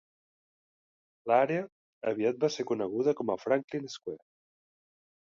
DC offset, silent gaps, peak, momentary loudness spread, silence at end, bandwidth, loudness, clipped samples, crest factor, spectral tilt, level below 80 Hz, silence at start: under 0.1%; 1.72-2.01 s, 3.64-3.68 s; -12 dBFS; 16 LU; 1.1 s; 7.6 kHz; -30 LUFS; under 0.1%; 22 dB; -5.5 dB/octave; -78 dBFS; 1.25 s